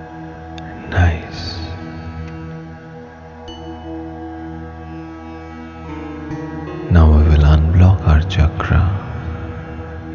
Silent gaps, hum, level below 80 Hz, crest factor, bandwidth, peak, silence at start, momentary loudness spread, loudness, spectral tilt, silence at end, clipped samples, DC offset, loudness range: none; none; -20 dBFS; 16 dB; 6.8 kHz; 0 dBFS; 0 s; 21 LU; -16 LUFS; -8 dB/octave; 0 s; under 0.1%; under 0.1%; 17 LU